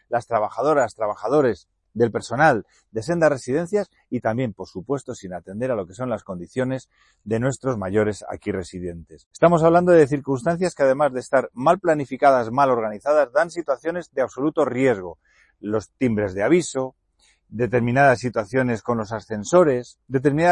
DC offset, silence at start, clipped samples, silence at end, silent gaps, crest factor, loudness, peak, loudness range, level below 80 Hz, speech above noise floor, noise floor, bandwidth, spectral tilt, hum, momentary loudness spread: under 0.1%; 0.1 s; under 0.1%; 0 s; 9.26-9.31 s; 18 dB; -21 LUFS; -4 dBFS; 7 LU; -56 dBFS; 41 dB; -62 dBFS; 11 kHz; -6.5 dB/octave; none; 13 LU